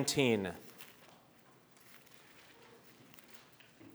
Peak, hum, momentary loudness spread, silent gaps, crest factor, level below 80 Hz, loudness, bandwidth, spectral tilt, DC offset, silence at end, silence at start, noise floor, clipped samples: -14 dBFS; none; 27 LU; none; 26 dB; -74 dBFS; -34 LUFS; over 20 kHz; -4 dB/octave; under 0.1%; 0.05 s; 0 s; -64 dBFS; under 0.1%